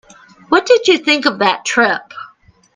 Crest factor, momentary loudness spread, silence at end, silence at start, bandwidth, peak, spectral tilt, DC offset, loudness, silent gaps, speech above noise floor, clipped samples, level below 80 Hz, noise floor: 16 dB; 12 LU; 0.5 s; 0.5 s; 9.8 kHz; 0 dBFS; -2.5 dB/octave; under 0.1%; -13 LUFS; none; 33 dB; under 0.1%; -58 dBFS; -47 dBFS